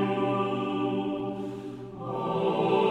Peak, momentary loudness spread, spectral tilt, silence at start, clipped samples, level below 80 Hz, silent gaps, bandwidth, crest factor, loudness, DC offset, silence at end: -14 dBFS; 12 LU; -8 dB/octave; 0 s; under 0.1%; -64 dBFS; none; 9 kHz; 14 dB; -29 LUFS; under 0.1%; 0 s